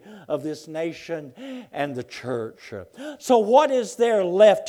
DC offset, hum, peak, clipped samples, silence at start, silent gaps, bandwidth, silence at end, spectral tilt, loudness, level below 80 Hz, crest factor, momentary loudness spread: under 0.1%; none; -4 dBFS; under 0.1%; 0.05 s; none; 13.5 kHz; 0 s; -5 dB/octave; -22 LUFS; -72 dBFS; 18 dB; 20 LU